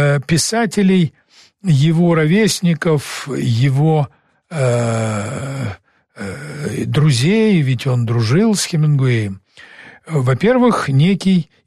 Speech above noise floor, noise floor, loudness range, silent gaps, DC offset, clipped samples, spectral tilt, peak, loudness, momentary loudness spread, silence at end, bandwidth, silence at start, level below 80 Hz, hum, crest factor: 26 dB; -41 dBFS; 4 LU; none; under 0.1%; under 0.1%; -6 dB/octave; -4 dBFS; -16 LUFS; 12 LU; 0.25 s; 13 kHz; 0 s; -50 dBFS; none; 10 dB